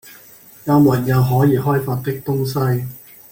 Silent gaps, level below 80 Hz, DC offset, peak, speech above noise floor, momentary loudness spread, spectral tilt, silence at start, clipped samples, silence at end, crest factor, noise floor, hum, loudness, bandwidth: none; -48 dBFS; under 0.1%; -2 dBFS; 28 dB; 12 LU; -8 dB/octave; 0.05 s; under 0.1%; 0.35 s; 16 dB; -44 dBFS; none; -17 LUFS; 17 kHz